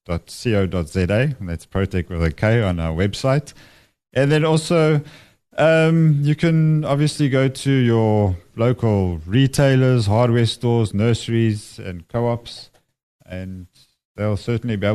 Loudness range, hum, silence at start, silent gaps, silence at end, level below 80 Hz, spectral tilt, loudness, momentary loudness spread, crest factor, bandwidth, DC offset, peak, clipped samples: 6 LU; none; 0.1 s; 13.03-13.19 s, 14.05-14.15 s; 0 s; -40 dBFS; -7 dB/octave; -19 LUFS; 12 LU; 16 dB; 13 kHz; under 0.1%; -2 dBFS; under 0.1%